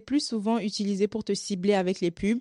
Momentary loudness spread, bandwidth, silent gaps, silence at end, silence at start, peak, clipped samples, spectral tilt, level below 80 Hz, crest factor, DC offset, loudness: 4 LU; 11.5 kHz; none; 0 s; 0.05 s; -12 dBFS; under 0.1%; -5 dB/octave; -58 dBFS; 14 dB; under 0.1%; -27 LUFS